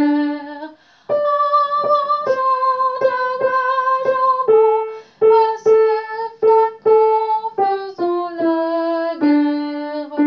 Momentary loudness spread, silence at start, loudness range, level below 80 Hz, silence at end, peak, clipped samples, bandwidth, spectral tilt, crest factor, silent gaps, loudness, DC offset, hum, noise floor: 9 LU; 0 s; 3 LU; -72 dBFS; 0 s; -4 dBFS; under 0.1%; 6.4 kHz; -6 dB/octave; 12 dB; none; -17 LUFS; under 0.1%; none; -36 dBFS